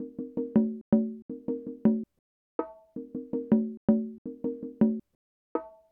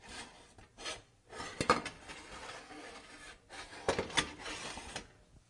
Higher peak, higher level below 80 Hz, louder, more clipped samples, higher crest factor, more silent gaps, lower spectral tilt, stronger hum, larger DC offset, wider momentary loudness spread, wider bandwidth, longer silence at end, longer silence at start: about the same, -12 dBFS vs -14 dBFS; about the same, -62 dBFS vs -60 dBFS; first, -30 LUFS vs -39 LUFS; neither; second, 18 dB vs 28 dB; first, 0.81-0.92 s, 1.22-1.29 s, 2.19-2.59 s, 3.77-3.88 s, 4.18-4.25 s, 5.15-5.55 s vs none; first, -12.5 dB/octave vs -2.5 dB/octave; neither; neither; second, 12 LU vs 20 LU; second, 3 kHz vs 11.5 kHz; about the same, 0.2 s vs 0.1 s; about the same, 0 s vs 0 s